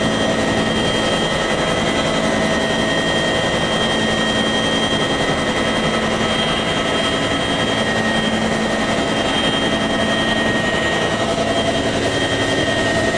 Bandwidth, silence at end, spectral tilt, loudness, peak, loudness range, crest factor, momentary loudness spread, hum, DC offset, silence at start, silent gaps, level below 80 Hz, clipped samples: 11 kHz; 0 s; -4 dB/octave; -17 LUFS; -4 dBFS; 1 LU; 14 dB; 1 LU; none; under 0.1%; 0 s; none; -36 dBFS; under 0.1%